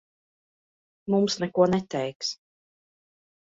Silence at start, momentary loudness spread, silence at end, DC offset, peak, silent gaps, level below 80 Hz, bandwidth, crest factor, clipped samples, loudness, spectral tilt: 1.05 s; 13 LU; 1.1 s; under 0.1%; -8 dBFS; 2.15-2.20 s; -64 dBFS; 7.8 kHz; 20 dB; under 0.1%; -26 LUFS; -5.5 dB/octave